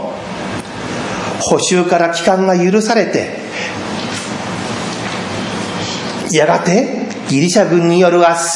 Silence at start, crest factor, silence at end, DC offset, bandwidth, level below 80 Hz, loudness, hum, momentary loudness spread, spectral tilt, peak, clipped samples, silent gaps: 0 s; 14 dB; 0 s; under 0.1%; 11.5 kHz; -52 dBFS; -15 LUFS; none; 11 LU; -4.5 dB/octave; 0 dBFS; under 0.1%; none